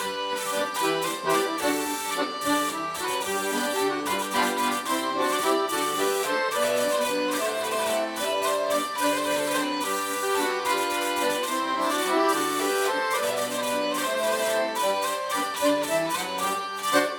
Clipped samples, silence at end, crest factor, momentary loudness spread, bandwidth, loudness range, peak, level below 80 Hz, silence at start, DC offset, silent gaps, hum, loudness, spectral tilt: under 0.1%; 0 s; 20 dB; 3 LU; over 20 kHz; 1 LU; -6 dBFS; -70 dBFS; 0 s; under 0.1%; none; none; -25 LUFS; -2 dB/octave